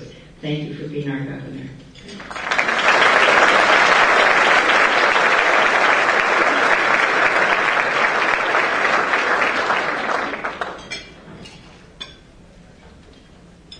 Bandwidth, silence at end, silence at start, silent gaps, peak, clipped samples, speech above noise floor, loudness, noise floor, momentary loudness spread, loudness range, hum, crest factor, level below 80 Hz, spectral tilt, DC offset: 10.5 kHz; 0.05 s; 0 s; none; 0 dBFS; under 0.1%; 19 dB; -15 LUFS; -45 dBFS; 19 LU; 12 LU; none; 18 dB; -52 dBFS; -3 dB/octave; under 0.1%